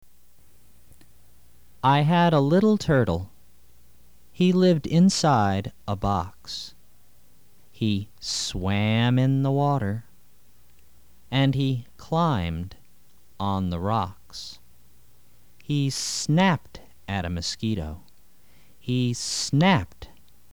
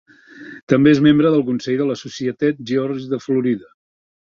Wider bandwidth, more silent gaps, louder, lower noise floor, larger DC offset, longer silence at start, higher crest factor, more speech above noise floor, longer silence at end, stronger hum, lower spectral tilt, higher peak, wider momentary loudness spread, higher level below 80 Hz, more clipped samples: first, over 20 kHz vs 7.2 kHz; second, none vs 0.63-0.67 s; second, -24 LUFS vs -18 LUFS; first, -60 dBFS vs -39 dBFS; first, 0.5% vs under 0.1%; first, 1.85 s vs 0.35 s; about the same, 18 dB vs 16 dB; first, 37 dB vs 23 dB; second, 0.45 s vs 0.6 s; neither; second, -5.5 dB/octave vs -7 dB/octave; second, -8 dBFS vs -2 dBFS; about the same, 15 LU vs 13 LU; first, -48 dBFS vs -58 dBFS; neither